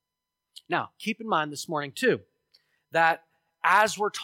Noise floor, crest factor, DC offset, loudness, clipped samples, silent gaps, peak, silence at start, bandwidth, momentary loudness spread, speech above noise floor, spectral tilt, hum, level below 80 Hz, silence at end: -86 dBFS; 20 dB; under 0.1%; -26 LUFS; under 0.1%; none; -8 dBFS; 0.7 s; 16.5 kHz; 11 LU; 60 dB; -3.5 dB/octave; none; -78 dBFS; 0 s